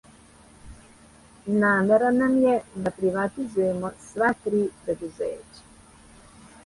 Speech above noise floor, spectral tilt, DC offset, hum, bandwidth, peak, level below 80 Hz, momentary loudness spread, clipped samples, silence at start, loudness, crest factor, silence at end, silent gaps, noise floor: 28 dB; -7 dB/octave; under 0.1%; none; 11.5 kHz; -8 dBFS; -56 dBFS; 13 LU; under 0.1%; 0.65 s; -24 LUFS; 18 dB; 1.25 s; none; -52 dBFS